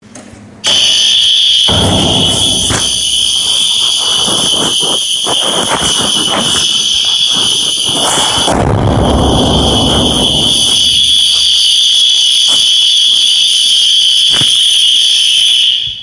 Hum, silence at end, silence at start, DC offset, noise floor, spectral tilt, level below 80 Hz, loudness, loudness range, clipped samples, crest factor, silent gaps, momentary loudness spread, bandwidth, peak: none; 0 s; 0.15 s; under 0.1%; -32 dBFS; -2 dB/octave; -28 dBFS; -7 LUFS; 4 LU; under 0.1%; 10 dB; none; 4 LU; 11.5 kHz; 0 dBFS